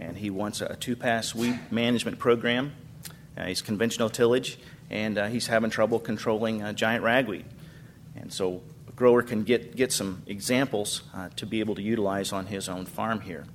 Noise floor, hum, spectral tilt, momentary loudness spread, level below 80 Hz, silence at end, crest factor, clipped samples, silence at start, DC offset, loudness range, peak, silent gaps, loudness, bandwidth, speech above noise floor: -47 dBFS; none; -4.5 dB/octave; 14 LU; -60 dBFS; 0 s; 20 dB; under 0.1%; 0 s; under 0.1%; 2 LU; -8 dBFS; none; -27 LUFS; 16 kHz; 20 dB